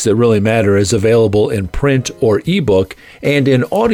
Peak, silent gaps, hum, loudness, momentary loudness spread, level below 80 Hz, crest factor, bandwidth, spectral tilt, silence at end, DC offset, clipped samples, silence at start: -2 dBFS; none; none; -13 LUFS; 5 LU; -34 dBFS; 10 dB; 17 kHz; -6 dB/octave; 0 s; under 0.1%; under 0.1%; 0 s